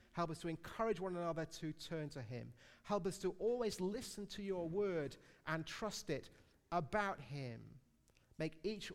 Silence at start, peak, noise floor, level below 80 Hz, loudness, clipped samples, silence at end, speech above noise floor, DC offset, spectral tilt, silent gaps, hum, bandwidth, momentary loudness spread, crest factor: 0.15 s; -26 dBFS; -73 dBFS; -66 dBFS; -43 LUFS; under 0.1%; 0 s; 30 dB; under 0.1%; -5.5 dB/octave; none; none; 16 kHz; 10 LU; 18 dB